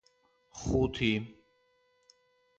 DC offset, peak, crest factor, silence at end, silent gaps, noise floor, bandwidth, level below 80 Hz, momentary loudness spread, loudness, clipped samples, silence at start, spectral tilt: under 0.1%; -16 dBFS; 20 dB; 1.25 s; none; -71 dBFS; 8.8 kHz; -48 dBFS; 20 LU; -31 LUFS; under 0.1%; 0.55 s; -5.5 dB/octave